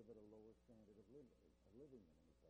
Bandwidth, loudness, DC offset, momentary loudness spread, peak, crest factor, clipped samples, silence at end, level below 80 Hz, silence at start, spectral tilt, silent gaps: 8.2 kHz; -67 LUFS; under 0.1%; 5 LU; -52 dBFS; 16 dB; under 0.1%; 0 s; -80 dBFS; 0 s; -7.5 dB/octave; none